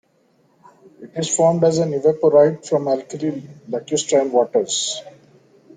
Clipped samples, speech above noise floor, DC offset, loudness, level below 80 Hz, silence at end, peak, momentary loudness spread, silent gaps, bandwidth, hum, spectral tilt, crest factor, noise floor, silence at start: under 0.1%; 42 dB; under 0.1%; -18 LUFS; -64 dBFS; 0.65 s; -2 dBFS; 14 LU; none; 9.6 kHz; none; -4.5 dB/octave; 18 dB; -60 dBFS; 1 s